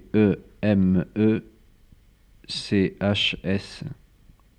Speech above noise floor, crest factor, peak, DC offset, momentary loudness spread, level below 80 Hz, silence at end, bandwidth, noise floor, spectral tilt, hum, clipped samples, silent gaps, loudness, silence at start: 33 dB; 18 dB; -8 dBFS; under 0.1%; 12 LU; -52 dBFS; 0.65 s; 9.6 kHz; -55 dBFS; -6.5 dB/octave; none; under 0.1%; none; -23 LUFS; 0.15 s